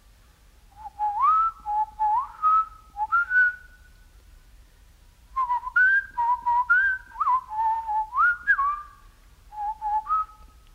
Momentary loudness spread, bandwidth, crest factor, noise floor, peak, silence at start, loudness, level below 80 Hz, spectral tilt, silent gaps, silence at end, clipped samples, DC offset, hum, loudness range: 14 LU; 15.5 kHz; 14 dB; -55 dBFS; -12 dBFS; 0.8 s; -23 LUFS; -52 dBFS; -2 dB/octave; none; 0.3 s; under 0.1%; under 0.1%; none; 3 LU